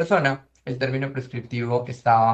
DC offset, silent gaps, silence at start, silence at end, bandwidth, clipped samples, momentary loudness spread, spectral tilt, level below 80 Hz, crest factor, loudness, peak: under 0.1%; none; 0 s; 0 s; 8.4 kHz; under 0.1%; 12 LU; -7 dB/octave; -62 dBFS; 18 dB; -25 LUFS; -6 dBFS